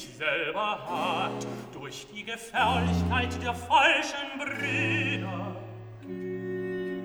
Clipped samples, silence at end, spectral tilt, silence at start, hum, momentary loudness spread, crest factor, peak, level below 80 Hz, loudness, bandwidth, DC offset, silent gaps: under 0.1%; 0 s; -4.5 dB/octave; 0 s; none; 16 LU; 20 dB; -10 dBFS; -50 dBFS; -28 LUFS; over 20 kHz; under 0.1%; none